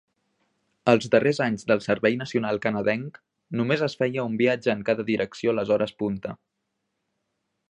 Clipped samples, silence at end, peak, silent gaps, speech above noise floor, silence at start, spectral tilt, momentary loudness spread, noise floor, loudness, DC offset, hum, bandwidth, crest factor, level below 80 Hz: under 0.1%; 1.35 s; -4 dBFS; none; 55 dB; 0.85 s; -6.5 dB/octave; 9 LU; -79 dBFS; -24 LUFS; under 0.1%; none; 10 kHz; 22 dB; -64 dBFS